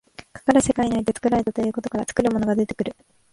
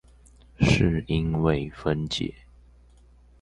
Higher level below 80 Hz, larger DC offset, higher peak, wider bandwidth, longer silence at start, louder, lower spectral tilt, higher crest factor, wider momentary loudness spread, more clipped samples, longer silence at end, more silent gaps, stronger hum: second, -48 dBFS vs -40 dBFS; neither; about the same, -4 dBFS vs -6 dBFS; about the same, 11.5 kHz vs 11 kHz; second, 0.2 s vs 0.6 s; first, -22 LUFS vs -25 LUFS; about the same, -5.5 dB/octave vs -6.5 dB/octave; about the same, 18 dB vs 22 dB; about the same, 9 LU vs 8 LU; neither; second, 0.4 s vs 1.1 s; neither; second, none vs 60 Hz at -45 dBFS